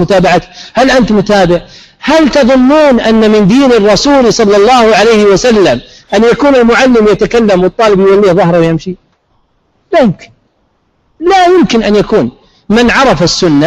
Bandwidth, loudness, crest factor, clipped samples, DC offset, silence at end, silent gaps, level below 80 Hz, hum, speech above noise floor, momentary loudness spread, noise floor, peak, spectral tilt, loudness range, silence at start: 12.5 kHz; -7 LUFS; 6 dB; under 0.1%; 0.4%; 0 s; none; -32 dBFS; none; 49 dB; 7 LU; -55 dBFS; 0 dBFS; -5 dB/octave; 5 LU; 0 s